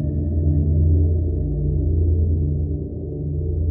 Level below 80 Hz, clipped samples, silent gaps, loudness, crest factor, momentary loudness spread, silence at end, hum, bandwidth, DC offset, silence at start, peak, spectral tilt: -24 dBFS; under 0.1%; none; -21 LUFS; 10 dB; 8 LU; 0 s; none; 0.8 kHz; under 0.1%; 0 s; -8 dBFS; -18.5 dB/octave